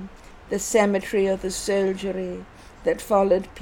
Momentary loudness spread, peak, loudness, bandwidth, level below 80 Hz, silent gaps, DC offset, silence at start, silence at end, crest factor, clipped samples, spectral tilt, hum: 11 LU; -6 dBFS; -23 LUFS; 18 kHz; -48 dBFS; none; under 0.1%; 0 s; 0 s; 18 dB; under 0.1%; -4.5 dB/octave; none